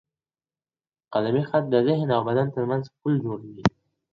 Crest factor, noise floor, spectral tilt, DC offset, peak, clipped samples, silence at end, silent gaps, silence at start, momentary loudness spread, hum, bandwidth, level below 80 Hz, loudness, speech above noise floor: 24 dB; under -90 dBFS; -8 dB/octave; under 0.1%; -2 dBFS; under 0.1%; 0.45 s; none; 1.1 s; 6 LU; none; 7.2 kHz; -54 dBFS; -25 LUFS; over 67 dB